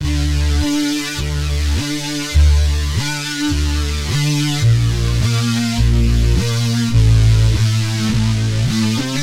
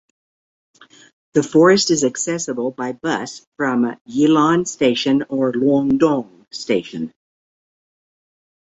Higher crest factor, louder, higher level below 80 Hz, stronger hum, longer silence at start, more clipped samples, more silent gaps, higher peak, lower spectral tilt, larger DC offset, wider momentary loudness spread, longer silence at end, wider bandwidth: second, 12 dB vs 18 dB; about the same, -16 LUFS vs -18 LUFS; first, -20 dBFS vs -60 dBFS; neither; second, 0 s vs 1.35 s; neither; second, none vs 3.47-3.52 s, 4.01-4.05 s; about the same, -2 dBFS vs -2 dBFS; about the same, -5 dB/octave vs -4.5 dB/octave; neither; second, 6 LU vs 11 LU; second, 0 s vs 1.55 s; first, 16 kHz vs 8 kHz